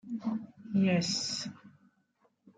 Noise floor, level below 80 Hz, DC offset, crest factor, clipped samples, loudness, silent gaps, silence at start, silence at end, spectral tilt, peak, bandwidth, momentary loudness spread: -73 dBFS; -76 dBFS; under 0.1%; 18 dB; under 0.1%; -32 LUFS; none; 0.05 s; 0.1 s; -4.5 dB/octave; -18 dBFS; 9.4 kHz; 11 LU